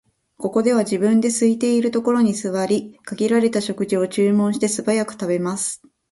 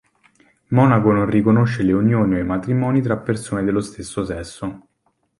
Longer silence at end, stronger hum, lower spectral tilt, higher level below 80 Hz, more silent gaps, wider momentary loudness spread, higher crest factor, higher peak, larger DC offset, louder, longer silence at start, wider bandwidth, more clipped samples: second, 0.35 s vs 0.6 s; neither; second, -5 dB/octave vs -8 dB/octave; second, -64 dBFS vs -44 dBFS; neither; second, 6 LU vs 13 LU; about the same, 14 dB vs 16 dB; second, -6 dBFS vs -2 dBFS; neither; about the same, -20 LUFS vs -18 LUFS; second, 0.4 s vs 0.7 s; about the same, 11.5 kHz vs 11.5 kHz; neither